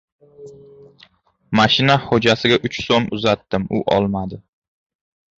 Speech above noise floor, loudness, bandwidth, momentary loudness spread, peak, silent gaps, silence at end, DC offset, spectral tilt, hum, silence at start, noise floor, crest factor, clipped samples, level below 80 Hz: 36 dB; -17 LUFS; 7.8 kHz; 8 LU; -2 dBFS; none; 1 s; under 0.1%; -5.5 dB/octave; none; 0.4 s; -54 dBFS; 18 dB; under 0.1%; -48 dBFS